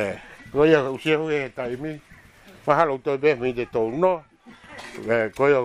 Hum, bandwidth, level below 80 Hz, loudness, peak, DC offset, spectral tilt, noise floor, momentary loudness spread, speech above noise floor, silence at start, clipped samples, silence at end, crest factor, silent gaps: none; 11.5 kHz; -54 dBFS; -23 LUFS; -4 dBFS; under 0.1%; -6.5 dB/octave; -49 dBFS; 16 LU; 27 dB; 0 s; under 0.1%; 0 s; 20 dB; none